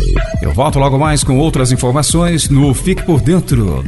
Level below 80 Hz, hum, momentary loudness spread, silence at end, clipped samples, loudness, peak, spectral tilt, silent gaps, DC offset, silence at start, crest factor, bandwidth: -20 dBFS; none; 3 LU; 0 s; under 0.1%; -12 LUFS; 0 dBFS; -5.5 dB/octave; none; under 0.1%; 0 s; 12 dB; 12 kHz